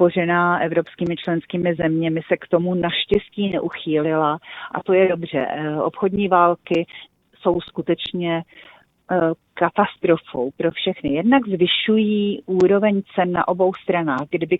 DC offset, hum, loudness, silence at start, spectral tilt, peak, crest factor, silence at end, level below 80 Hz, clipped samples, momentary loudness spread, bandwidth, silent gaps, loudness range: under 0.1%; none; -20 LUFS; 0 s; -8 dB/octave; -2 dBFS; 18 dB; 0 s; -54 dBFS; under 0.1%; 7 LU; 5.2 kHz; none; 4 LU